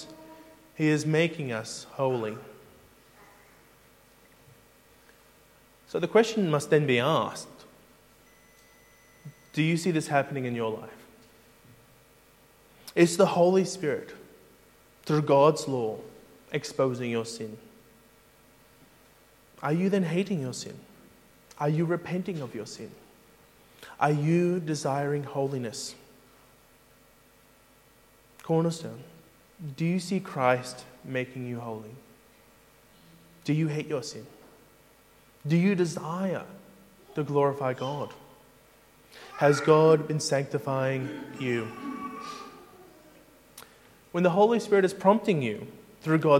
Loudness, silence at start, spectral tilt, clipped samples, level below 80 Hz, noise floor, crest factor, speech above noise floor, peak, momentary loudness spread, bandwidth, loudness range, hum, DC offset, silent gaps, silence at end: -27 LUFS; 0 s; -6 dB/octave; under 0.1%; -70 dBFS; -59 dBFS; 24 dB; 33 dB; -6 dBFS; 21 LU; 16.5 kHz; 9 LU; none; under 0.1%; none; 0 s